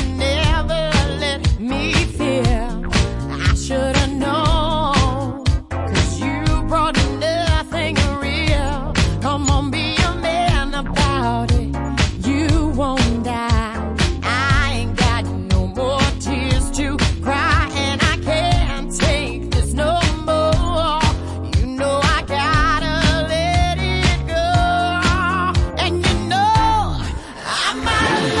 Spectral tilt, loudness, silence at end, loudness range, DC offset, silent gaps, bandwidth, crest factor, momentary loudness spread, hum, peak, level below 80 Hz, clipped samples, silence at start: -5 dB/octave; -18 LUFS; 0 s; 2 LU; under 0.1%; none; 11.5 kHz; 14 dB; 4 LU; none; -4 dBFS; -24 dBFS; under 0.1%; 0 s